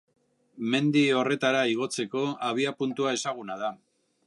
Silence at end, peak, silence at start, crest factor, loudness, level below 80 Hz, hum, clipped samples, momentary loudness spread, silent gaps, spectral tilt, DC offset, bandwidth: 0.5 s; -10 dBFS; 0.55 s; 18 dB; -27 LUFS; -80 dBFS; none; under 0.1%; 11 LU; none; -4.5 dB/octave; under 0.1%; 11.5 kHz